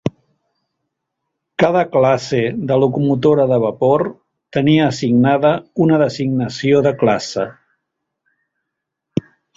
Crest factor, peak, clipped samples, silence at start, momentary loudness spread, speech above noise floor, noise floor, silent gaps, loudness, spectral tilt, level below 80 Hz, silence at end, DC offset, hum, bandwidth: 16 dB; -2 dBFS; under 0.1%; 0.05 s; 11 LU; 64 dB; -79 dBFS; none; -16 LUFS; -7 dB/octave; -54 dBFS; 0.35 s; under 0.1%; none; 7.8 kHz